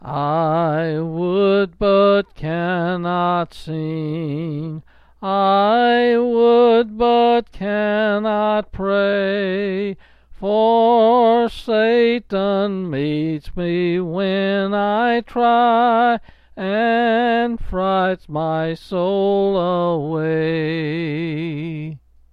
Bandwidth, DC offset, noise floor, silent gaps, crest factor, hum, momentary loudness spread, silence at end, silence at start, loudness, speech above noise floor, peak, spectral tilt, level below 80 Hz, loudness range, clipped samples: 5.6 kHz; under 0.1%; -39 dBFS; none; 12 dB; none; 11 LU; 0.35 s; 0 s; -18 LUFS; 19 dB; -6 dBFS; -8 dB/octave; -44 dBFS; 4 LU; under 0.1%